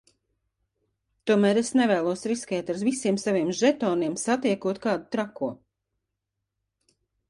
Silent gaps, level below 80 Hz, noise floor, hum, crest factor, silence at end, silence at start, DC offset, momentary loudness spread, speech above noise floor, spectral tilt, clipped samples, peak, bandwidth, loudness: none; -68 dBFS; -83 dBFS; none; 18 dB; 1.75 s; 1.25 s; under 0.1%; 9 LU; 59 dB; -5 dB/octave; under 0.1%; -10 dBFS; 11.5 kHz; -25 LUFS